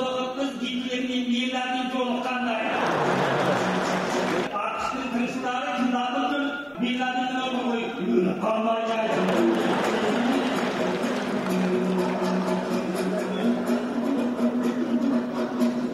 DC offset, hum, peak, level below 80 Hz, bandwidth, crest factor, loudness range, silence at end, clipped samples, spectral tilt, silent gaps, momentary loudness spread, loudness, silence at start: under 0.1%; none; -10 dBFS; -62 dBFS; 14.5 kHz; 16 dB; 2 LU; 0 s; under 0.1%; -5.5 dB/octave; none; 4 LU; -25 LUFS; 0 s